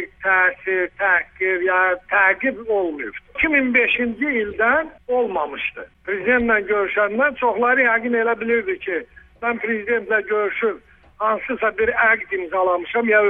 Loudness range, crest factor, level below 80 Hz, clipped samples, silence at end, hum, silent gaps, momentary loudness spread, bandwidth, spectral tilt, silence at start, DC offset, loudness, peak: 3 LU; 16 dB; -50 dBFS; under 0.1%; 0 s; none; none; 9 LU; 3.8 kHz; -7 dB/octave; 0 s; under 0.1%; -19 LUFS; -2 dBFS